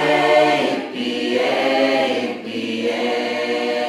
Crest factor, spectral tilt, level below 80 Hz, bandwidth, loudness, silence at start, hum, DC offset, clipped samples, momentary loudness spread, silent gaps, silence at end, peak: 16 dB; -4 dB/octave; -76 dBFS; 15.5 kHz; -19 LUFS; 0 s; none; under 0.1%; under 0.1%; 9 LU; none; 0 s; -4 dBFS